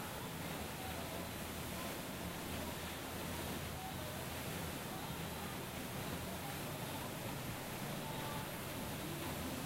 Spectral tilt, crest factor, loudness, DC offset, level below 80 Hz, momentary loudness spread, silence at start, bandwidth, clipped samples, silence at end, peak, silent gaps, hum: -4 dB/octave; 14 dB; -44 LUFS; under 0.1%; -58 dBFS; 1 LU; 0 s; 16 kHz; under 0.1%; 0 s; -30 dBFS; none; none